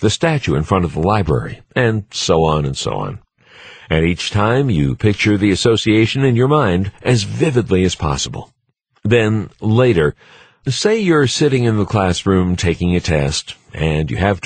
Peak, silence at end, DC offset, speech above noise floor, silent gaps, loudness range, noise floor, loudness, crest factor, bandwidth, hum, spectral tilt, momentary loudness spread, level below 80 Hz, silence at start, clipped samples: -2 dBFS; 0.05 s; under 0.1%; 44 dB; none; 3 LU; -59 dBFS; -16 LUFS; 14 dB; 9.6 kHz; none; -5.5 dB/octave; 8 LU; -34 dBFS; 0 s; under 0.1%